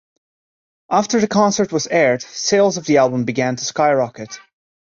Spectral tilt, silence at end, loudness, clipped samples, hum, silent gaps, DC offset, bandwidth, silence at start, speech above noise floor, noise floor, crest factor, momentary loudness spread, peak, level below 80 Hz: -4 dB/octave; 0.5 s; -17 LUFS; under 0.1%; none; none; under 0.1%; 7.6 kHz; 0.9 s; over 73 dB; under -90 dBFS; 16 dB; 7 LU; -2 dBFS; -60 dBFS